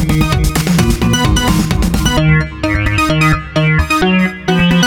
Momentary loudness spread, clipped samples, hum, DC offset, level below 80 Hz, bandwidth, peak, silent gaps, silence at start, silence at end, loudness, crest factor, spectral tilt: 2 LU; under 0.1%; none; under 0.1%; -20 dBFS; 18.5 kHz; 0 dBFS; none; 0 s; 0 s; -12 LUFS; 12 dB; -5 dB/octave